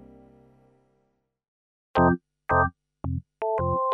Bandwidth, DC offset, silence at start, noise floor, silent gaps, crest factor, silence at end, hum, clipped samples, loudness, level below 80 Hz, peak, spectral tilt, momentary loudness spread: 5.6 kHz; under 0.1%; 1.95 s; -73 dBFS; none; 20 dB; 0 s; 50 Hz at -65 dBFS; under 0.1%; -26 LUFS; -48 dBFS; -10 dBFS; -10 dB/octave; 11 LU